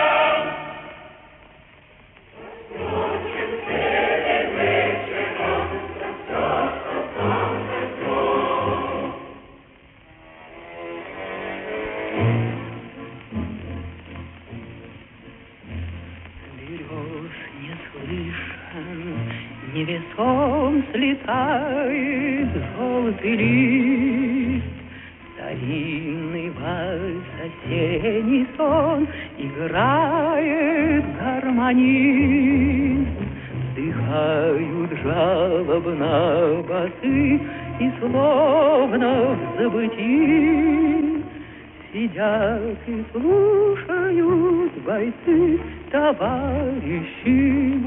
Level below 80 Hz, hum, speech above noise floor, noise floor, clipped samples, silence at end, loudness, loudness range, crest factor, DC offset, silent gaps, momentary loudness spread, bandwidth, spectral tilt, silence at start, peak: -44 dBFS; none; 30 dB; -49 dBFS; under 0.1%; 0 s; -21 LUFS; 13 LU; 16 dB; under 0.1%; none; 18 LU; 3.9 kHz; -5 dB/octave; 0 s; -6 dBFS